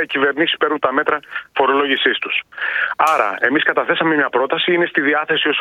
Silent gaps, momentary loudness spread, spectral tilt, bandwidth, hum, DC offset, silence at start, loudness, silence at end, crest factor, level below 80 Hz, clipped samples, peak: none; 5 LU; -4 dB/octave; 14.5 kHz; none; under 0.1%; 0 s; -16 LUFS; 0 s; 16 dB; -66 dBFS; under 0.1%; 0 dBFS